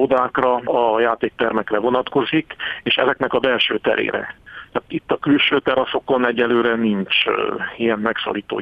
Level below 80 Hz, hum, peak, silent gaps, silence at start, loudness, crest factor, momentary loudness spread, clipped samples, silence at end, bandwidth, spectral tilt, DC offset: -54 dBFS; none; 0 dBFS; none; 0 s; -19 LUFS; 18 dB; 8 LU; under 0.1%; 0 s; 5.6 kHz; -7 dB/octave; under 0.1%